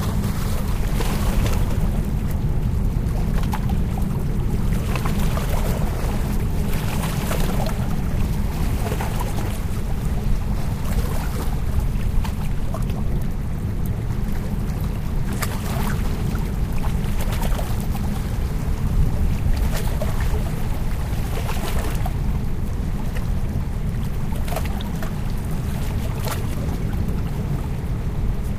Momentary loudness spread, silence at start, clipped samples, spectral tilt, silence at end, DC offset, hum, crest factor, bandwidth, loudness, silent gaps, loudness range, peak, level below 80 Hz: 3 LU; 0 s; under 0.1%; -6.5 dB/octave; 0 s; under 0.1%; none; 14 dB; 15.5 kHz; -25 LUFS; none; 2 LU; -6 dBFS; -24 dBFS